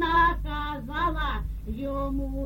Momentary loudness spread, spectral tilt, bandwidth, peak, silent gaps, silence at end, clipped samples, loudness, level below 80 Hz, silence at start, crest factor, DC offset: 12 LU; -7 dB/octave; 17 kHz; -12 dBFS; none; 0 s; under 0.1%; -28 LUFS; -32 dBFS; 0 s; 16 dB; under 0.1%